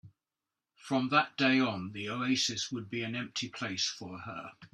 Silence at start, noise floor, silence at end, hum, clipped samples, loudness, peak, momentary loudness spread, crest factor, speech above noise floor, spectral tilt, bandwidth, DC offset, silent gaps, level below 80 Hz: 0.05 s; under -90 dBFS; 0.1 s; none; under 0.1%; -32 LUFS; -12 dBFS; 15 LU; 22 dB; over 57 dB; -3.5 dB/octave; 12 kHz; under 0.1%; none; -74 dBFS